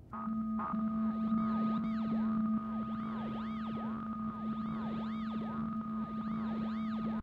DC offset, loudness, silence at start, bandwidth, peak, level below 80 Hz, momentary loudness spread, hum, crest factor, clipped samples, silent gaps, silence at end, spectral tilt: under 0.1%; -37 LUFS; 0 s; 4.8 kHz; -24 dBFS; -60 dBFS; 6 LU; none; 12 dB; under 0.1%; none; 0 s; -9 dB/octave